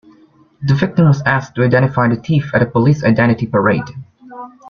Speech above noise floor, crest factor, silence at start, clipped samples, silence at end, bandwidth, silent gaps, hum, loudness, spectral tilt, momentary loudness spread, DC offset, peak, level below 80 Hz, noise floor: 35 dB; 14 dB; 0.6 s; under 0.1%; 0 s; 6.8 kHz; none; none; -14 LUFS; -8.5 dB/octave; 13 LU; under 0.1%; 0 dBFS; -46 dBFS; -49 dBFS